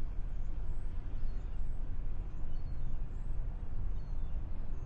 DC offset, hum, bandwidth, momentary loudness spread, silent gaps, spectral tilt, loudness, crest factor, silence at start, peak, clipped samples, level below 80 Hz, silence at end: under 0.1%; none; 2.5 kHz; 1 LU; none; -8.5 dB/octave; -44 LUFS; 10 dB; 0 s; -22 dBFS; under 0.1%; -36 dBFS; 0 s